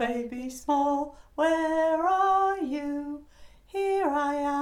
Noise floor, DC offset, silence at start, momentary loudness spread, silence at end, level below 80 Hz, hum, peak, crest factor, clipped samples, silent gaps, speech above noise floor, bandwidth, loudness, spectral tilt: -51 dBFS; under 0.1%; 0 s; 12 LU; 0 s; -56 dBFS; none; -14 dBFS; 14 dB; under 0.1%; none; 25 dB; 15.5 kHz; -27 LUFS; -4 dB/octave